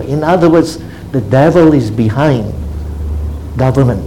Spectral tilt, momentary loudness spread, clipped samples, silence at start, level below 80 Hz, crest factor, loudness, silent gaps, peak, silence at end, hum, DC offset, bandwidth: -8 dB/octave; 13 LU; 0.4%; 0 s; -24 dBFS; 12 dB; -12 LUFS; none; 0 dBFS; 0 s; none; 0.8%; 15.5 kHz